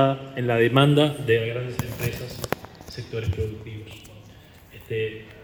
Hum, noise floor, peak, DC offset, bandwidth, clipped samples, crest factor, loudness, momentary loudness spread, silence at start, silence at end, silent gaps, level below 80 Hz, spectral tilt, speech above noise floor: none; -48 dBFS; 0 dBFS; under 0.1%; over 20 kHz; under 0.1%; 24 dB; -24 LUFS; 20 LU; 0 s; 0 s; none; -48 dBFS; -6.5 dB/octave; 24 dB